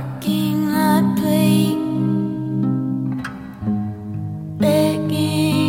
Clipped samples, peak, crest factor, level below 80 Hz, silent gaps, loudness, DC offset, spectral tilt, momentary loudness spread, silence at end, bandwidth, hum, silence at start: under 0.1%; -4 dBFS; 14 dB; -52 dBFS; none; -19 LUFS; under 0.1%; -6.5 dB/octave; 11 LU; 0 s; 17 kHz; none; 0 s